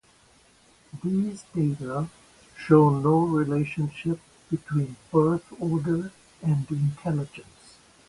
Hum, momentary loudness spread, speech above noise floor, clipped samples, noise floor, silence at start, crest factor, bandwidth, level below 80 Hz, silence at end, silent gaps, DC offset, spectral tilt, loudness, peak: none; 14 LU; 34 dB; under 0.1%; -58 dBFS; 0.95 s; 22 dB; 11.5 kHz; -58 dBFS; 0.65 s; none; under 0.1%; -8.5 dB/octave; -26 LUFS; -4 dBFS